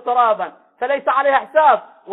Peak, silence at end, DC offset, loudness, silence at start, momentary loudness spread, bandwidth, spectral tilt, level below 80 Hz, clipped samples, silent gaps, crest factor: -2 dBFS; 0 s; under 0.1%; -16 LUFS; 0.05 s; 10 LU; 4.1 kHz; -6 dB/octave; -68 dBFS; under 0.1%; none; 16 dB